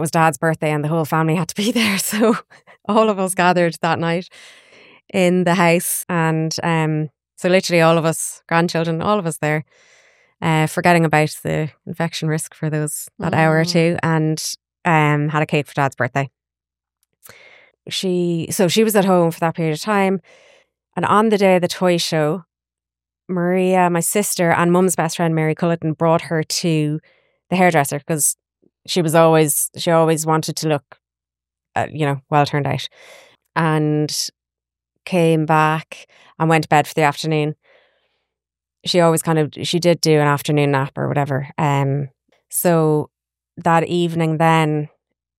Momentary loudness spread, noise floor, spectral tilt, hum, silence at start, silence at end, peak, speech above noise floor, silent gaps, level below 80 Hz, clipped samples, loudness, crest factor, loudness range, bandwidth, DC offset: 10 LU; -89 dBFS; -5 dB/octave; none; 0 s; 0.5 s; -2 dBFS; 72 dB; none; -62 dBFS; under 0.1%; -18 LUFS; 18 dB; 4 LU; 16.5 kHz; under 0.1%